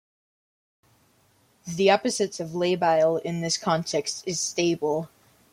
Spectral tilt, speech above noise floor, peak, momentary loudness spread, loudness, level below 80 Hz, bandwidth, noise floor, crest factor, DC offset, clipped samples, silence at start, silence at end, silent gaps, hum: -4 dB/octave; 39 dB; -6 dBFS; 8 LU; -25 LUFS; -68 dBFS; 16 kHz; -63 dBFS; 20 dB; under 0.1%; under 0.1%; 1.65 s; 0.45 s; none; none